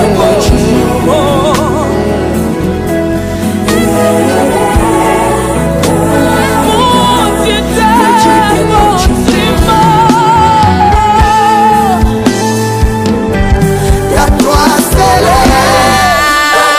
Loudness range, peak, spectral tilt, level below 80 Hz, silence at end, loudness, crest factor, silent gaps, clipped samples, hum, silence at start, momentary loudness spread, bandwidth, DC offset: 3 LU; 0 dBFS; -5 dB/octave; -18 dBFS; 0 s; -8 LUFS; 8 dB; none; 0.3%; none; 0 s; 5 LU; 16 kHz; under 0.1%